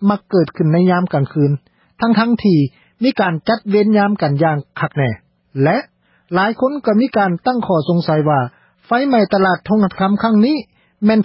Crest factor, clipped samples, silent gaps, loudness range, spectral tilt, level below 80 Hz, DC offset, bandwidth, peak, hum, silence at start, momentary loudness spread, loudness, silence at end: 14 dB; under 0.1%; none; 2 LU; -12.5 dB/octave; -52 dBFS; under 0.1%; 5.8 kHz; -2 dBFS; none; 0 s; 7 LU; -16 LUFS; 0 s